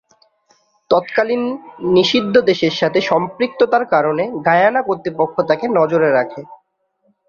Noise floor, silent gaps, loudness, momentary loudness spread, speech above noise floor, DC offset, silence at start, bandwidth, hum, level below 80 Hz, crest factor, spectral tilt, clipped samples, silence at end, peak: -64 dBFS; none; -16 LUFS; 7 LU; 48 dB; under 0.1%; 0.9 s; 7 kHz; none; -60 dBFS; 16 dB; -5.5 dB/octave; under 0.1%; 0.75 s; 0 dBFS